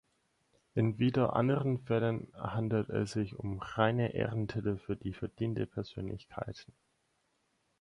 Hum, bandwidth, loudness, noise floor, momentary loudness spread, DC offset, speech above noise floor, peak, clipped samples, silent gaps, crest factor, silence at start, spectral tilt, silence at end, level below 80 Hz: none; 10.5 kHz; -34 LUFS; -77 dBFS; 12 LU; under 0.1%; 44 dB; -14 dBFS; under 0.1%; none; 20 dB; 0.75 s; -8 dB/octave; 1.15 s; -58 dBFS